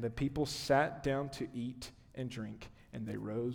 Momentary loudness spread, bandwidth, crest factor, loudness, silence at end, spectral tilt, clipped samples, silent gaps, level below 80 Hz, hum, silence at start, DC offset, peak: 17 LU; 19.5 kHz; 20 dB; -37 LUFS; 0 s; -5.5 dB/octave; under 0.1%; none; -58 dBFS; none; 0 s; under 0.1%; -18 dBFS